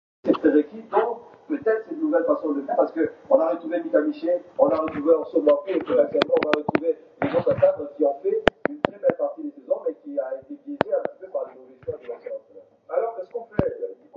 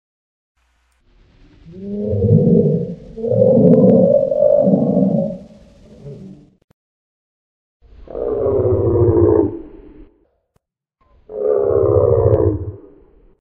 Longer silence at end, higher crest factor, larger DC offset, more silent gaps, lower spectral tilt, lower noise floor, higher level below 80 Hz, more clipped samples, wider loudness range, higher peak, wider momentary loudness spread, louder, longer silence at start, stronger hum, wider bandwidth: second, 0.2 s vs 0.65 s; first, 24 dB vs 16 dB; neither; second, none vs 6.64-7.80 s; second, -7.5 dB/octave vs -13 dB/octave; second, -50 dBFS vs -67 dBFS; second, -54 dBFS vs -38 dBFS; neither; about the same, 8 LU vs 10 LU; about the same, 0 dBFS vs 0 dBFS; second, 14 LU vs 22 LU; second, -24 LUFS vs -15 LUFS; second, 0.25 s vs 1.65 s; neither; first, 6.8 kHz vs 3.3 kHz